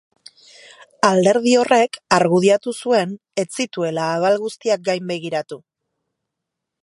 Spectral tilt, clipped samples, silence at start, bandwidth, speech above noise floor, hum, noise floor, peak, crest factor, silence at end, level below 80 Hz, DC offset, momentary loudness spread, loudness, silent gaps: -4.5 dB/octave; under 0.1%; 1.05 s; 11.5 kHz; 63 dB; none; -81 dBFS; 0 dBFS; 20 dB; 1.25 s; -66 dBFS; under 0.1%; 11 LU; -18 LUFS; none